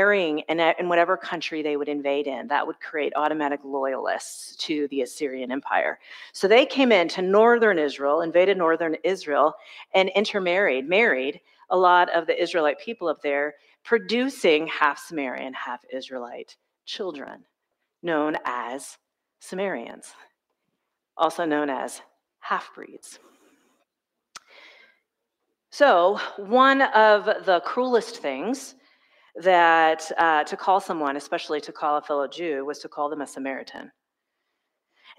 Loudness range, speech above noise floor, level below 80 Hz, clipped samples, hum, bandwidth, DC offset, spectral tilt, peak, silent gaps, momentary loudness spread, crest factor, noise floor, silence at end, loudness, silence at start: 11 LU; 60 dB; -80 dBFS; under 0.1%; none; 15 kHz; under 0.1%; -4 dB/octave; -4 dBFS; none; 17 LU; 20 dB; -83 dBFS; 1.3 s; -23 LUFS; 0 s